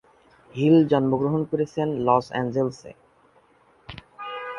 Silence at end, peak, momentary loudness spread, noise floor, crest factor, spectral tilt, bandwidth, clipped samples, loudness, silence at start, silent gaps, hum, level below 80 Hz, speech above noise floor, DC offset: 0 s; -4 dBFS; 24 LU; -59 dBFS; 20 dB; -8 dB/octave; 7.2 kHz; under 0.1%; -22 LUFS; 0.55 s; none; none; -58 dBFS; 37 dB; under 0.1%